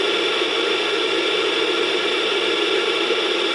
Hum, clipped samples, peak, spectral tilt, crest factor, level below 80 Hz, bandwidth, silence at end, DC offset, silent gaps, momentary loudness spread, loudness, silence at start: none; under 0.1%; -6 dBFS; -1.5 dB/octave; 14 dB; -70 dBFS; 11.5 kHz; 0 s; under 0.1%; none; 1 LU; -19 LUFS; 0 s